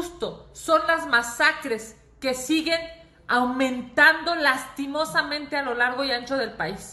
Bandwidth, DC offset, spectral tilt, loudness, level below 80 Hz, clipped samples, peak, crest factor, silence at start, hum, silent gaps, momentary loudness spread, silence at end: 13 kHz; under 0.1%; -2.5 dB/octave; -23 LUFS; -56 dBFS; under 0.1%; -4 dBFS; 20 dB; 0 s; none; none; 14 LU; 0 s